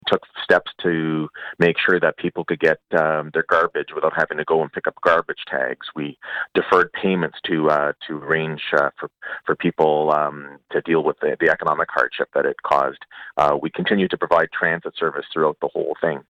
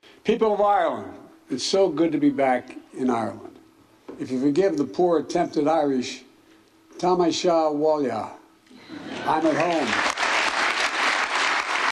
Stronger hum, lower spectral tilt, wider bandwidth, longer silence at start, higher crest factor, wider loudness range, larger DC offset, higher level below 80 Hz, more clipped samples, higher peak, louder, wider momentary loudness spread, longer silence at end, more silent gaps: neither; first, -6.5 dB/octave vs -4 dB/octave; second, 9.6 kHz vs 12.5 kHz; second, 0.05 s vs 0.25 s; about the same, 16 dB vs 14 dB; about the same, 1 LU vs 2 LU; neither; about the same, -60 dBFS vs -62 dBFS; neither; first, -4 dBFS vs -8 dBFS; about the same, -21 LUFS vs -22 LUFS; second, 8 LU vs 13 LU; about the same, 0.1 s vs 0 s; neither